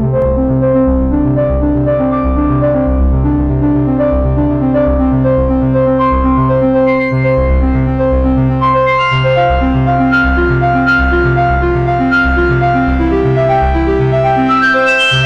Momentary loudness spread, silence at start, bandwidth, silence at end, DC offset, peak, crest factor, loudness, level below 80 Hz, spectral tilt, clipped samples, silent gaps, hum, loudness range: 2 LU; 0 s; 8.4 kHz; 0 s; under 0.1%; -2 dBFS; 8 dB; -11 LUFS; -18 dBFS; -8 dB/octave; under 0.1%; none; none; 1 LU